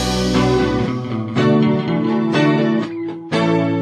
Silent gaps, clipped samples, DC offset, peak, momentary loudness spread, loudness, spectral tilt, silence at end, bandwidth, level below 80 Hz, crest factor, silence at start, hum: none; under 0.1%; under 0.1%; -2 dBFS; 7 LU; -17 LUFS; -6.5 dB/octave; 0 s; 13.5 kHz; -36 dBFS; 14 dB; 0 s; none